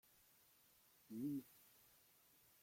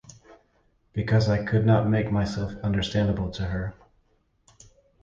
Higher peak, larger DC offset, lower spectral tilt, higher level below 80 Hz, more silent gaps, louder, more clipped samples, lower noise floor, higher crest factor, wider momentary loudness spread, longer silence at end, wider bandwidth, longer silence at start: second, -38 dBFS vs -8 dBFS; neither; about the same, -6.5 dB/octave vs -7.5 dB/octave; second, under -90 dBFS vs -44 dBFS; neither; second, -50 LUFS vs -25 LUFS; neither; first, -74 dBFS vs -66 dBFS; about the same, 18 dB vs 18 dB; first, 21 LU vs 11 LU; second, 0.85 s vs 1.3 s; first, 16.5 kHz vs 7.6 kHz; first, 1.1 s vs 0.05 s